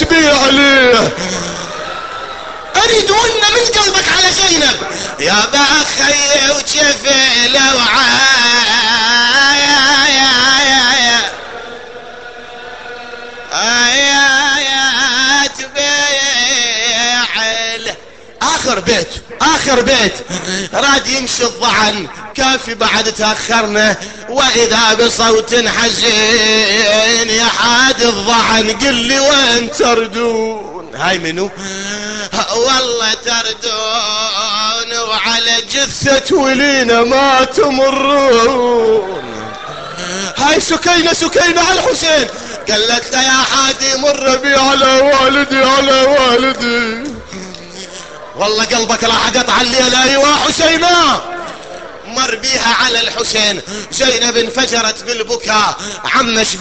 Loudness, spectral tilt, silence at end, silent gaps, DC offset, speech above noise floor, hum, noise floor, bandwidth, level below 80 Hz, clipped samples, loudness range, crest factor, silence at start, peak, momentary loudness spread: -10 LUFS; -1.5 dB/octave; 0 s; none; 0.8%; 22 dB; none; -34 dBFS; 9 kHz; -40 dBFS; under 0.1%; 5 LU; 12 dB; 0 s; 0 dBFS; 15 LU